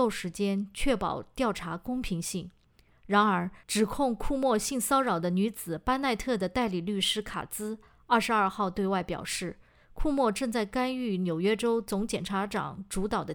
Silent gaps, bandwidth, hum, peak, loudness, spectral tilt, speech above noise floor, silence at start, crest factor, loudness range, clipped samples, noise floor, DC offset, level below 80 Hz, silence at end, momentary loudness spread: none; over 20 kHz; none; -12 dBFS; -29 LUFS; -4.5 dB/octave; 31 dB; 0 s; 18 dB; 2 LU; under 0.1%; -60 dBFS; under 0.1%; -46 dBFS; 0 s; 9 LU